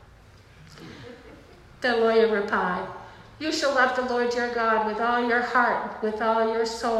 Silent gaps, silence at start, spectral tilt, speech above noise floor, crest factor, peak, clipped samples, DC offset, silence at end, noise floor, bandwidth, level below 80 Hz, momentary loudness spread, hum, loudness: none; 0.6 s; -4 dB/octave; 27 dB; 16 dB; -8 dBFS; under 0.1%; under 0.1%; 0 s; -51 dBFS; 13 kHz; -56 dBFS; 19 LU; none; -24 LUFS